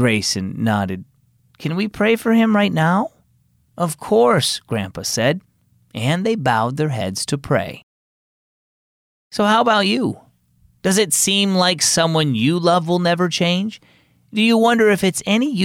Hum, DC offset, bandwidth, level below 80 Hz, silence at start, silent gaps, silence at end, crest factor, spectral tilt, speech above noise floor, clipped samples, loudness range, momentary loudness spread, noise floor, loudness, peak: none; under 0.1%; 17 kHz; -56 dBFS; 0 s; 7.83-9.31 s; 0 s; 14 dB; -4 dB/octave; 42 dB; under 0.1%; 5 LU; 10 LU; -59 dBFS; -17 LUFS; -4 dBFS